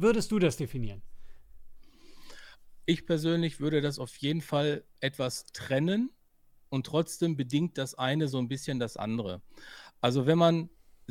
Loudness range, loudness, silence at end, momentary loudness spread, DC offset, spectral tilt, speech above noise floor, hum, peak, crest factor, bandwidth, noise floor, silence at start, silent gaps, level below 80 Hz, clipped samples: 3 LU; -30 LUFS; 0.4 s; 13 LU; under 0.1%; -6 dB/octave; 32 dB; none; -10 dBFS; 20 dB; 16 kHz; -61 dBFS; 0 s; none; -54 dBFS; under 0.1%